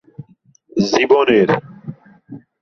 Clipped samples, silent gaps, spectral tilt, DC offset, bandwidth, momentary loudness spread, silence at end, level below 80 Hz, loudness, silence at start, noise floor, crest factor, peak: under 0.1%; none; -5.5 dB/octave; under 0.1%; 7.4 kHz; 23 LU; 0.25 s; -56 dBFS; -15 LUFS; 0.2 s; -53 dBFS; 16 dB; -2 dBFS